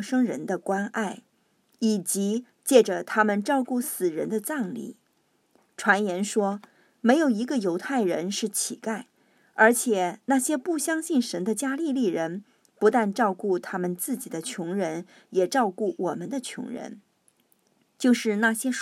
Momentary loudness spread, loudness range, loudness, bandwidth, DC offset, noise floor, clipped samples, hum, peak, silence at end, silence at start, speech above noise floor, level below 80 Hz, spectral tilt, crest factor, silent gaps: 12 LU; 4 LU; -26 LUFS; 16 kHz; under 0.1%; -69 dBFS; under 0.1%; none; -4 dBFS; 0 s; 0 s; 44 dB; -84 dBFS; -4 dB/octave; 22 dB; none